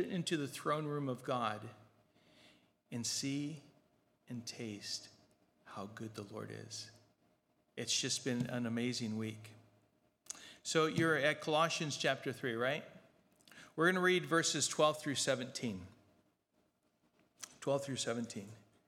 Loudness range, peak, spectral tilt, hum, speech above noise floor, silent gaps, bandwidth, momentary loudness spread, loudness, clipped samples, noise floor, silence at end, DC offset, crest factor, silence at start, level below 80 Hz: 11 LU; -16 dBFS; -3.5 dB/octave; none; 42 dB; none; 16.5 kHz; 17 LU; -37 LUFS; under 0.1%; -79 dBFS; 0.3 s; under 0.1%; 24 dB; 0 s; -82 dBFS